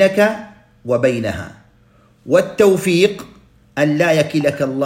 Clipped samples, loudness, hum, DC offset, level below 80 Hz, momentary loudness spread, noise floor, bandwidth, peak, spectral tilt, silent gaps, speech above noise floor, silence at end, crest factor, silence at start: under 0.1%; -16 LUFS; none; under 0.1%; -52 dBFS; 16 LU; -51 dBFS; 16.5 kHz; 0 dBFS; -5.5 dB/octave; none; 36 dB; 0 s; 16 dB; 0 s